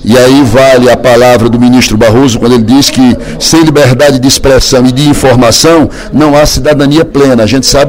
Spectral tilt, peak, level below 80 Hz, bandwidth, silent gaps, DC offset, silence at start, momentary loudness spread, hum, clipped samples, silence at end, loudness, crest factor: -4.5 dB/octave; 0 dBFS; -22 dBFS; 19.5 kHz; none; under 0.1%; 0 s; 3 LU; none; 10%; 0 s; -4 LUFS; 4 dB